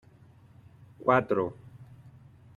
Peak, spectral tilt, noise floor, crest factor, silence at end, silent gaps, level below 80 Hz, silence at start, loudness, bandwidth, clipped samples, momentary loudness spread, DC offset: -10 dBFS; -8.5 dB/octave; -56 dBFS; 22 dB; 0.7 s; none; -66 dBFS; 1 s; -28 LUFS; 12 kHz; under 0.1%; 26 LU; under 0.1%